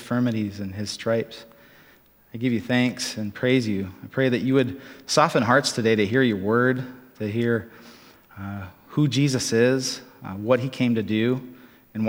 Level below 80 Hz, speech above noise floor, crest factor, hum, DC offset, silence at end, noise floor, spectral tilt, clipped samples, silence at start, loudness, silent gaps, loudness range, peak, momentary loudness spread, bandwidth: -64 dBFS; 32 dB; 22 dB; none; under 0.1%; 0 s; -55 dBFS; -5.5 dB/octave; under 0.1%; 0 s; -23 LUFS; none; 5 LU; -2 dBFS; 16 LU; 16.5 kHz